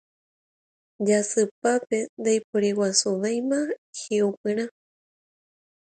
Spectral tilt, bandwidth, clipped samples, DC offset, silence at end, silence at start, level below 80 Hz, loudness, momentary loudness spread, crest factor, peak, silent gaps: -3.5 dB/octave; 9.4 kHz; under 0.1%; under 0.1%; 1.25 s; 1 s; -74 dBFS; -25 LUFS; 7 LU; 22 dB; -6 dBFS; 1.51-1.62 s, 2.09-2.17 s, 2.44-2.53 s, 3.78-3.93 s, 4.37-4.44 s